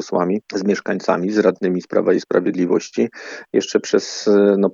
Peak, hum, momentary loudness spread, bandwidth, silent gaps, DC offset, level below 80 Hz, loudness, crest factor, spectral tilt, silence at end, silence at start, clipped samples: 0 dBFS; none; 7 LU; 7.6 kHz; none; under 0.1%; -76 dBFS; -18 LUFS; 18 dB; -5.5 dB/octave; 0 s; 0 s; under 0.1%